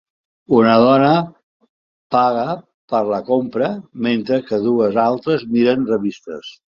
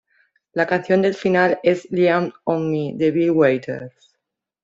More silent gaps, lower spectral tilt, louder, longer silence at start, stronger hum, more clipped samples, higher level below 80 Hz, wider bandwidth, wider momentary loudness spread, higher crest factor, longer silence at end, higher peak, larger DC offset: first, 1.43-1.60 s, 1.69-2.10 s, 2.74-2.88 s vs none; about the same, -8 dB/octave vs -7.5 dB/octave; about the same, -17 LUFS vs -19 LUFS; about the same, 0.5 s vs 0.55 s; neither; neither; about the same, -58 dBFS vs -62 dBFS; about the same, 7 kHz vs 7.6 kHz; first, 13 LU vs 10 LU; about the same, 16 dB vs 16 dB; second, 0.25 s vs 0.75 s; about the same, 0 dBFS vs -2 dBFS; neither